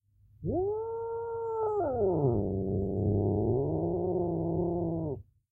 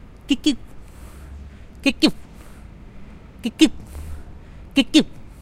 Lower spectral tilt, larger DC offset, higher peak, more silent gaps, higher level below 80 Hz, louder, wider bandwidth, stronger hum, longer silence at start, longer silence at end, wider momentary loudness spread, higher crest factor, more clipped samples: first, -14.5 dB/octave vs -4 dB/octave; neither; second, -16 dBFS vs 0 dBFS; neither; second, -50 dBFS vs -40 dBFS; second, -31 LUFS vs -20 LUFS; second, 1.6 kHz vs 14.5 kHz; neither; first, 0.4 s vs 0.25 s; first, 0.3 s vs 0.1 s; second, 7 LU vs 25 LU; second, 14 dB vs 24 dB; neither